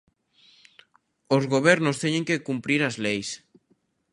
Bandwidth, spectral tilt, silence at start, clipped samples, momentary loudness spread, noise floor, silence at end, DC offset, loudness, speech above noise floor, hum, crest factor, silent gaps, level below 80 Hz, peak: 11.5 kHz; -5 dB/octave; 1.3 s; under 0.1%; 9 LU; -68 dBFS; 0.75 s; under 0.1%; -24 LUFS; 45 dB; none; 22 dB; none; -68 dBFS; -4 dBFS